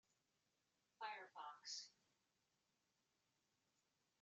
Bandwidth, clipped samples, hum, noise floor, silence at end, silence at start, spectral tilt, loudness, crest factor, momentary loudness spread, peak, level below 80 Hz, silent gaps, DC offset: 8 kHz; under 0.1%; none; -88 dBFS; 2.3 s; 1 s; 3 dB/octave; -55 LUFS; 22 dB; 5 LU; -38 dBFS; under -90 dBFS; none; under 0.1%